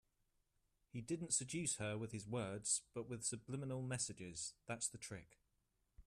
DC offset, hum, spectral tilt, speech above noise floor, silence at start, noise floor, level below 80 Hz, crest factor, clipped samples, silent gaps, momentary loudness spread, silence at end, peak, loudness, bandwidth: under 0.1%; none; -3.5 dB/octave; 39 dB; 0.95 s; -84 dBFS; -74 dBFS; 22 dB; under 0.1%; none; 11 LU; 0.05 s; -24 dBFS; -44 LUFS; 14 kHz